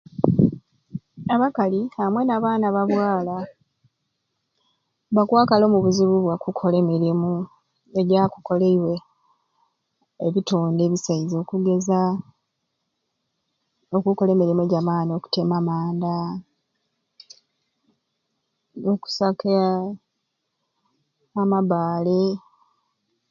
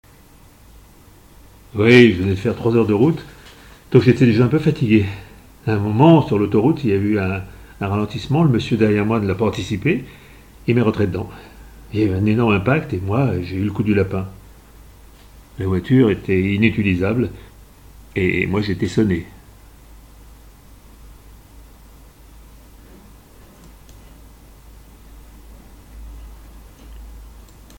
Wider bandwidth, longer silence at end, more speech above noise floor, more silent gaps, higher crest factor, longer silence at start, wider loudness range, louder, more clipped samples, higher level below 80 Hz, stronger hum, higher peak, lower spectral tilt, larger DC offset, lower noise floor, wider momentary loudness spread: second, 7.4 kHz vs 17 kHz; first, 0.9 s vs 0.4 s; first, 56 dB vs 30 dB; neither; about the same, 22 dB vs 20 dB; second, 0.2 s vs 1.75 s; about the same, 6 LU vs 7 LU; second, -21 LUFS vs -18 LUFS; neither; second, -60 dBFS vs -44 dBFS; neither; about the same, 0 dBFS vs 0 dBFS; about the same, -7.5 dB/octave vs -8 dB/octave; neither; first, -77 dBFS vs -47 dBFS; about the same, 12 LU vs 14 LU